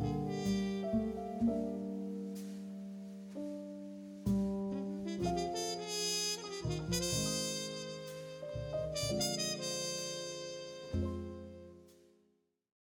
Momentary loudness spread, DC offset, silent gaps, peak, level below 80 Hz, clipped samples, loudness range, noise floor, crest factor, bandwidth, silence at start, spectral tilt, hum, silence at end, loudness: 12 LU; under 0.1%; none; -24 dBFS; -56 dBFS; under 0.1%; 5 LU; -76 dBFS; 16 dB; 18 kHz; 0 s; -4 dB/octave; none; 0.95 s; -38 LUFS